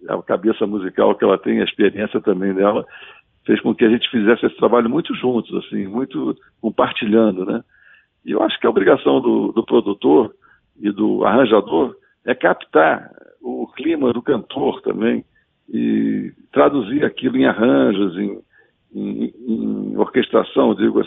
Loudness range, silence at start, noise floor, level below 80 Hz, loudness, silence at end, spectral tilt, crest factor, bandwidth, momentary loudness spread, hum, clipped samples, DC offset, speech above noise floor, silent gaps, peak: 3 LU; 0 s; -52 dBFS; -58 dBFS; -18 LUFS; 0 s; -10.5 dB/octave; 18 dB; 4 kHz; 11 LU; none; under 0.1%; under 0.1%; 35 dB; none; 0 dBFS